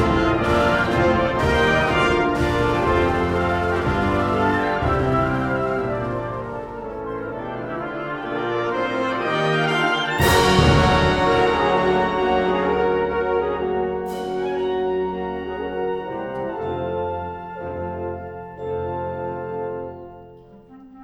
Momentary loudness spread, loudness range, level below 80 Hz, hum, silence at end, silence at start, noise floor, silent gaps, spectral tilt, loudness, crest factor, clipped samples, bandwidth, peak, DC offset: 12 LU; 10 LU; -36 dBFS; none; 0 s; 0 s; -44 dBFS; none; -6 dB/octave; -21 LUFS; 18 dB; under 0.1%; 18.5 kHz; -4 dBFS; under 0.1%